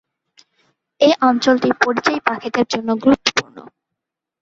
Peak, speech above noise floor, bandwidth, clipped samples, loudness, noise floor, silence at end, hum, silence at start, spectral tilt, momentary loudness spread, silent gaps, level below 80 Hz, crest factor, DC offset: 0 dBFS; 66 dB; 7.8 kHz; under 0.1%; -16 LUFS; -82 dBFS; 0.75 s; none; 1 s; -3.5 dB/octave; 6 LU; none; -56 dBFS; 18 dB; under 0.1%